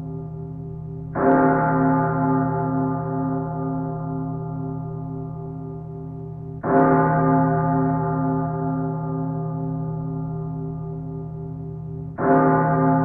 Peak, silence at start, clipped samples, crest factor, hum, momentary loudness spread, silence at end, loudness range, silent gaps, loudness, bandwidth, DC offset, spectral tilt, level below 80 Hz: -6 dBFS; 0 s; under 0.1%; 16 dB; none; 16 LU; 0 s; 7 LU; none; -23 LUFS; 2.6 kHz; under 0.1%; -13.5 dB/octave; -46 dBFS